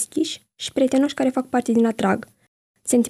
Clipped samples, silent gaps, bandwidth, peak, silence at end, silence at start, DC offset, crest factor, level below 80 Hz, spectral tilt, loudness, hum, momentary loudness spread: under 0.1%; 2.48-2.74 s; 14 kHz; -8 dBFS; 0 s; 0 s; under 0.1%; 14 dB; -62 dBFS; -4.5 dB/octave; -22 LUFS; none; 9 LU